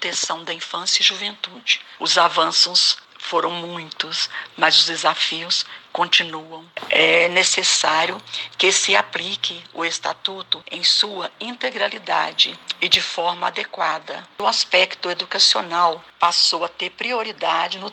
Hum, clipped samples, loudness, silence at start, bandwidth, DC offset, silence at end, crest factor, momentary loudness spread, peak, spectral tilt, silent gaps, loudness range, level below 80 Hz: none; under 0.1%; -18 LUFS; 0 s; 16.5 kHz; under 0.1%; 0 s; 20 dB; 12 LU; -2 dBFS; 0 dB/octave; none; 3 LU; -70 dBFS